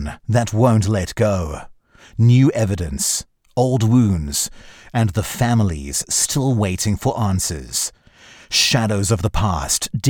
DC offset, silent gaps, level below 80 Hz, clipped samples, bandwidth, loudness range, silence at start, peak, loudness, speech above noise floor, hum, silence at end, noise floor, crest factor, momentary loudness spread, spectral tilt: under 0.1%; none; -36 dBFS; under 0.1%; 19 kHz; 2 LU; 0 s; -2 dBFS; -18 LUFS; 28 dB; none; 0 s; -46 dBFS; 16 dB; 8 LU; -4.5 dB/octave